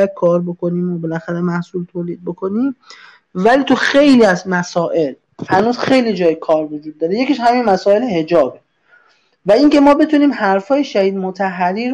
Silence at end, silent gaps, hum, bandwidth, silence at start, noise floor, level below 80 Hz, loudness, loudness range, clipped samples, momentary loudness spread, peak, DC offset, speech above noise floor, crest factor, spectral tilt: 0 s; none; none; 10 kHz; 0 s; -53 dBFS; -54 dBFS; -15 LUFS; 4 LU; under 0.1%; 12 LU; -2 dBFS; under 0.1%; 39 dB; 12 dB; -6 dB/octave